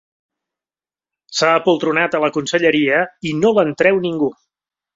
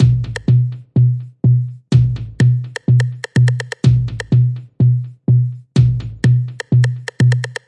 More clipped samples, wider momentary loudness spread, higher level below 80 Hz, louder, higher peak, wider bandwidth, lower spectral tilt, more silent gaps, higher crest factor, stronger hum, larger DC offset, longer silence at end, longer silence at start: neither; first, 7 LU vs 3 LU; second, -60 dBFS vs -36 dBFS; about the same, -16 LUFS vs -16 LUFS; about the same, -2 dBFS vs 0 dBFS; second, 7.8 kHz vs 10 kHz; second, -4.5 dB/octave vs -7.5 dB/octave; neither; about the same, 16 dB vs 14 dB; neither; neither; first, 0.65 s vs 0.15 s; first, 1.3 s vs 0 s